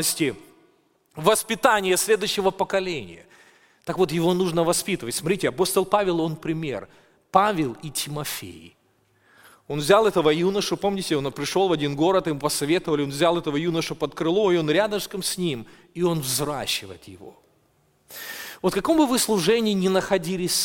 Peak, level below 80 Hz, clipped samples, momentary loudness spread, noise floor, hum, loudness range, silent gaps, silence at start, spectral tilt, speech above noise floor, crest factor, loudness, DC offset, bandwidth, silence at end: -2 dBFS; -54 dBFS; under 0.1%; 12 LU; -64 dBFS; none; 5 LU; none; 0 s; -4 dB/octave; 41 dB; 22 dB; -23 LUFS; under 0.1%; 17 kHz; 0 s